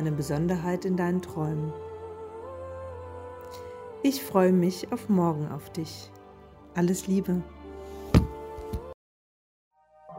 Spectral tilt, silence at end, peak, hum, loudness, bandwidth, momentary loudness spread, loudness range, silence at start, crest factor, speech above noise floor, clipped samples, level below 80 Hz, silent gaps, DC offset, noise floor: -7 dB/octave; 0 s; -6 dBFS; none; -28 LUFS; 16 kHz; 17 LU; 5 LU; 0 s; 24 dB; 23 dB; under 0.1%; -44 dBFS; 8.94-9.71 s; under 0.1%; -50 dBFS